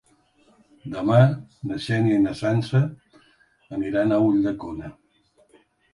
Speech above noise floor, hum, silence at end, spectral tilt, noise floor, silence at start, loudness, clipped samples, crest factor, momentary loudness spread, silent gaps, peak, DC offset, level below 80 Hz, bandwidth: 41 dB; none; 1.05 s; -8.5 dB/octave; -62 dBFS; 0.85 s; -22 LUFS; under 0.1%; 20 dB; 17 LU; none; -4 dBFS; under 0.1%; -56 dBFS; 11 kHz